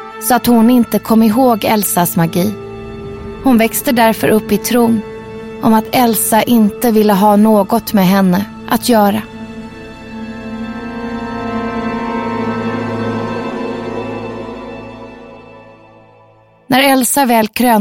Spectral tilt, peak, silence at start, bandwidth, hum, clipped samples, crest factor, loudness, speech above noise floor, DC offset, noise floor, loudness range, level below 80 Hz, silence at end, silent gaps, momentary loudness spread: -5 dB/octave; 0 dBFS; 0 s; 16.5 kHz; none; under 0.1%; 12 dB; -13 LUFS; 35 dB; under 0.1%; -46 dBFS; 11 LU; -42 dBFS; 0 s; none; 18 LU